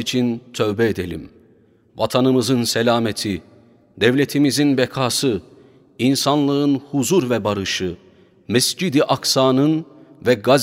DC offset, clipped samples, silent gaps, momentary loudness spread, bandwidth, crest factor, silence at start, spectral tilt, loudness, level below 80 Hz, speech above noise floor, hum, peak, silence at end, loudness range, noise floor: under 0.1%; under 0.1%; none; 9 LU; 16 kHz; 18 dB; 0 s; -4.5 dB/octave; -19 LUFS; -56 dBFS; 36 dB; none; 0 dBFS; 0 s; 2 LU; -54 dBFS